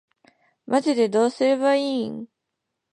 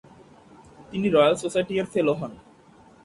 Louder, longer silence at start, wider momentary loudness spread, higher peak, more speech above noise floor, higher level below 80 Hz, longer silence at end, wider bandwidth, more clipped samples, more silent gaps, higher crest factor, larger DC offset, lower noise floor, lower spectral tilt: about the same, -22 LUFS vs -23 LUFS; about the same, 0.7 s vs 0.8 s; second, 9 LU vs 13 LU; about the same, -8 dBFS vs -6 dBFS; first, 60 dB vs 30 dB; second, -76 dBFS vs -60 dBFS; about the same, 0.7 s vs 0.7 s; about the same, 11 kHz vs 11.5 kHz; neither; neither; about the same, 16 dB vs 20 dB; neither; first, -81 dBFS vs -53 dBFS; about the same, -4.5 dB/octave vs -5.5 dB/octave